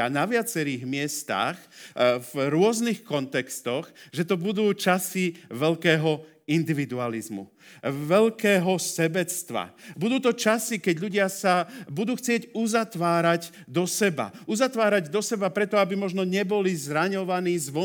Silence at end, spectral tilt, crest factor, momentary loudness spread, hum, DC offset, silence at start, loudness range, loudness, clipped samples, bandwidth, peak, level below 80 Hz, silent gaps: 0 s; -4.5 dB/octave; 20 dB; 9 LU; none; under 0.1%; 0 s; 2 LU; -25 LUFS; under 0.1%; over 20 kHz; -6 dBFS; -76 dBFS; none